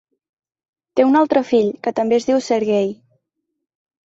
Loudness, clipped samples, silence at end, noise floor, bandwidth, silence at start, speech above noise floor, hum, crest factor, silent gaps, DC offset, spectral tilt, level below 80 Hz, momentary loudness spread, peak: -17 LUFS; under 0.1%; 1.1 s; -76 dBFS; 8 kHz; 0.95 s; 60 dB; none; 16 dB; none; under 0.1%; -5.5 dB/octave; -64 dBFS; 7 LU; -4 dBFS